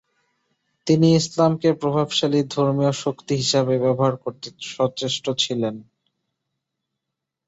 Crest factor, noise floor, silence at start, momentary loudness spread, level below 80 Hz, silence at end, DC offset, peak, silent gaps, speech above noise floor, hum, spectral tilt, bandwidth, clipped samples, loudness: 18 dB; -83 dBFS; 0.85 s; 13 LU; -62 dBFS; 1.65 s; under 0.1%; -4 dBFS; none; 62 dB; none; -5.5 dB/octave; 8 kHz; under 0.1%; -21 LUFS